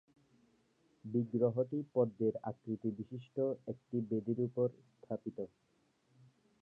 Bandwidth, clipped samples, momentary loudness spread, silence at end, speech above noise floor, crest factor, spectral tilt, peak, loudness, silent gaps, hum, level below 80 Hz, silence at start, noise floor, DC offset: 3.8 kHz; under 0.1%; 12 LU; 1.15 s; 37 dB; 20 dB; -11.5 dB/octave; -18 dBFS; -38 LUFS; none; none; -80 dBFS; 1.05 s; -74 dBFS; under 0.1%